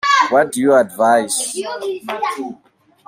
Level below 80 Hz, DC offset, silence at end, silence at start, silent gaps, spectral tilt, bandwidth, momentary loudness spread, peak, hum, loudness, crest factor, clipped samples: -66 dBFS; under 0.1%; 0.55 s; 0.05 s; none; -2.5 dB/octave; 16 kHz; 11 LU; -2 dBFS; none; -16 LUFS; 16 dB; under 0.1%